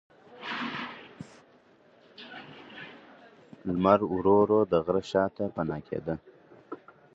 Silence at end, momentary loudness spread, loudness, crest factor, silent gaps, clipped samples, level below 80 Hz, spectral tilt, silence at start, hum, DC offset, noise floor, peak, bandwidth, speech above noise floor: 0.4 s; 22 LU; -28 LUFS; 22 dB; none; under 0.1%; -60 dBFS; -7.5 dB/octave; 0.3 s; none; under 0.1%; -60 dBFS; -8 dBFS; 8 kHz; 34 dB